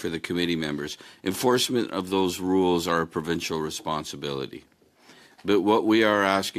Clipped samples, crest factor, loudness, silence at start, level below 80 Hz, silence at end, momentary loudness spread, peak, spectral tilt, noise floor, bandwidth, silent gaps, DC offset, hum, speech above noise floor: under 0.1%; 20 dB; -25 LUFS; 0 s; -62 dBFS; 0 s; 12 LU; -6 dBFS; -4.5 dB/octave; -55 dBFS; 14.5 kHz; none; under 0.1%; none; 30 dB